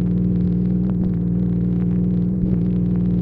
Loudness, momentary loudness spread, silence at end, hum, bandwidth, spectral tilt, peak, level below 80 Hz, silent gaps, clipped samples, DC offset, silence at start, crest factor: -20 LUFS; 1 LU; 0 s; 60 Hz at -30 dBFS; 2.4 kHz; -13 dB/octave; -8 dBFS; -32 dBFS; none; under 0.1%; under 0.1%; 0 s; 10 dB